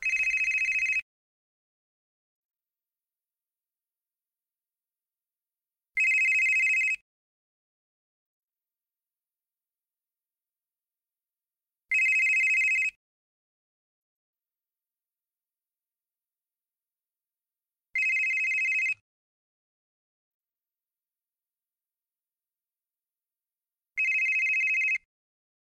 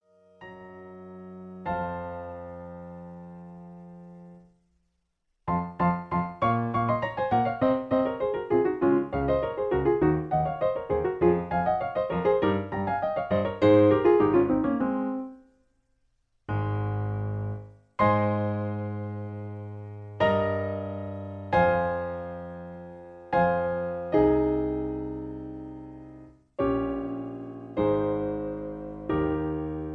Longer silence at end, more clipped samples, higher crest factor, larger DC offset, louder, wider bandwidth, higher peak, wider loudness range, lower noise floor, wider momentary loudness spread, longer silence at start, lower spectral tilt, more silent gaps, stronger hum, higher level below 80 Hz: first, 0.75 s vs 0 s; neither; about the same, 14 dB vs 18 dB; neither; first, -24 LUFS vs -27 LUFS; first, 13.5 kHz vs 5.8 kHz; second, -18 dBFS vs -10 dBFS; second, 8 LU vs 14 LU; first, under -90 dBFS vs -76 dBFS; second, 9 LU vs 20 LU; second, 0 s vs 0.4 s; second, 3 dB/octave vs -10 dB/octave; first, 1.02-2.49 s, 7.01-8.48 s, 12.96-14.33 s, 19.01-20.40 s vs none; neither; second, -72 dBFS vs -50 dBFS